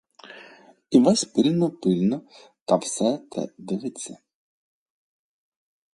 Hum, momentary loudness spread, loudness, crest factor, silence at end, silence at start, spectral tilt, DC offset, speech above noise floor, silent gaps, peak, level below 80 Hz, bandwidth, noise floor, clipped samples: none; 19 LU; -23 LUFS; 22 dB; 1.8 s; 0.3 s; -5.5 dB/octave; under 0.1%; 28 dB; 2.61-2.66 s; -4 dBFS; -68 dBFS; 11.5 kHz; -51 dBFS; under 0.1%